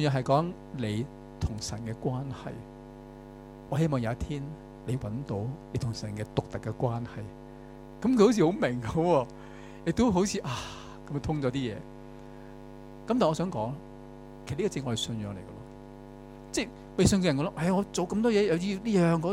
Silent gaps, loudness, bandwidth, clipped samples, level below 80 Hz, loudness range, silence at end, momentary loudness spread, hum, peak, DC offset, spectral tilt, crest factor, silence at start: none; -29 LUFS; 15.5 kHz; under 0.1%; -50 dBFS; 7 LU; 0 s; 22 LU; 60 Hz at -60 dBFS; -10 dBFS; under 0.1%; -6 dB/octave; 20 dB; 0 s